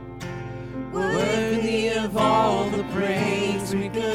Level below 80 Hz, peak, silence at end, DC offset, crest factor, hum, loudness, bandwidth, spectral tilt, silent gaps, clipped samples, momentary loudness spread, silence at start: -48 dBFS; -8 dBFS; 0 s; under 0.1%; 16 dB; none; -23 LUFS; 16 kHz; -5.5 dB/octave; none; under 0.1%; 13 LU; 0 s